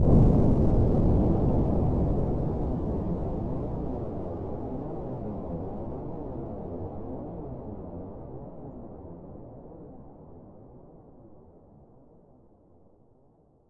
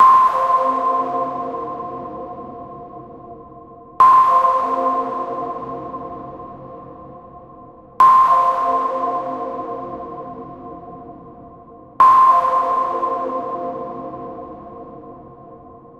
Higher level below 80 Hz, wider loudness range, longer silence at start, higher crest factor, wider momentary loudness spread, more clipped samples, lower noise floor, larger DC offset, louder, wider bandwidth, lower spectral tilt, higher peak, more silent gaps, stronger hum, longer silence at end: first, -34 dBFS vs -54 dBFS; first, 22 LU vs 8 LU; about the same, 0 s vs 0 s; about the same, 20 dB vs 16 dB; second, 22 LU vs 25 LU; neither; first, -61 dBFS vs -41 dBFS; neither; second, -29 LUFS vs -16 LUFS; second, 4.9 kHz vs 8.6 kHz; first, -12 dB/octave vs -6 dB/octave; second, -8 dBFS vs -2 dBFS; neither; neither; first, 0.4 s vs 0.15 s